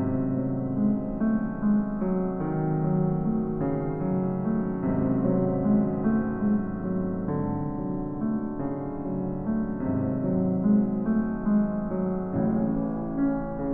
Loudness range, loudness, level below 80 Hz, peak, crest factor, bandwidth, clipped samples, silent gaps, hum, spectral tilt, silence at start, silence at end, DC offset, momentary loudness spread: 3 LU; -27 LUFS; -44 dBFS; -12 dBFS; 14 dB; 2.6 kHz; under 0.1%; none; none; -13.5 dB/octave; 0 s; 0 s; under 0.1%; 6 LU